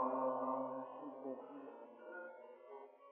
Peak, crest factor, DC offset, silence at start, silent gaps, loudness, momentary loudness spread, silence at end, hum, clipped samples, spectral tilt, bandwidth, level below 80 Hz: -28 dBFS; 16 dB; under 0.1%; 0 s; none; -45 LUFS; 17 LU; 0 s; none; under 0.1%; -1 dB/octave; 3.6 kHz; under -90 dBFS